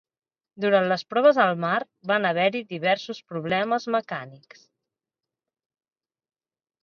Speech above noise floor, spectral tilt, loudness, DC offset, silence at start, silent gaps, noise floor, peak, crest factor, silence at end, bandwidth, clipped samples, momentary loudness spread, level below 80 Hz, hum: 65 dB; -6 dB/octave; -23 LUFS; under 0.1%; 0.6 s; none; -89 dBFS; -6 dBFS; 20 dB; 2.45 s; 6.8 kHz; under 0.1%; 13 LU; -76 dBFS; none